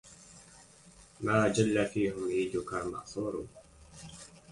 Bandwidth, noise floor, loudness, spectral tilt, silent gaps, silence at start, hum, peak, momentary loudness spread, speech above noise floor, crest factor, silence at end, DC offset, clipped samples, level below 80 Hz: 11.5 kHz; -57 dBFS; -32 LUFS; -5.5 dB/octave; none; 0.05 s; none; -12 dBFS; 24 LU; 26 dB; 20 dB; 0 s; under 0.1%; under 0.1%; -60 dBFS